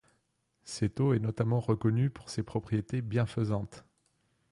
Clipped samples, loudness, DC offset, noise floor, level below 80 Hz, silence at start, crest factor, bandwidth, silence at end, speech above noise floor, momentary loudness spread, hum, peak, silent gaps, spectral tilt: under 0.1%; -31 LUFS; under 0.1%; -76 dBFS; -58 dBFS; 0.65 s; 16 dB; 11.5 kHz; 0.7 s; 46 dB; 7 LU; none; -16 dBFS; none; -7.5 dB/octave